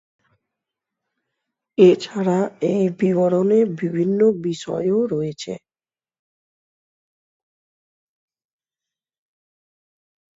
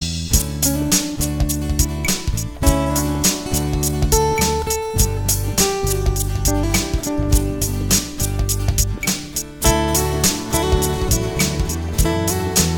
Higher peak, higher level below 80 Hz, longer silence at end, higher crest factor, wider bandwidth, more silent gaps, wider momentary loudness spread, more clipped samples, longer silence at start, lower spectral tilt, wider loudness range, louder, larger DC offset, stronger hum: about the same, -2 dBFS vs 0 dBFS; second, -66 dBFS vs -24 dBFS; first, 4.8 s vs 0 s; about the same, 20 dB vs 18 dB; second, 7.8 kHz vs over 20 kHz; neither; first, 13 LU vs 5 LU; neither; first, 1.8 s vs 0 s; first, -7.5 dB/octave vs -4 dB/octave; first, 10 LU vs 1 LU; about the same, -19 LUFS vs -19 LUFS; neither; neither